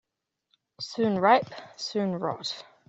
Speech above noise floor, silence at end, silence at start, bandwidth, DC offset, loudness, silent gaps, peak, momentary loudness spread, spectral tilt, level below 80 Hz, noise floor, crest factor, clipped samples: 56 dB; 0.25 s; 0.8 s; 8.2 kHz; under 0.1%; -27 LUFS; none; -6 dBFS; 15 LU; -5 dB/octave; -72 dBFS; -83 dBFS; 22 dB; under 0.1%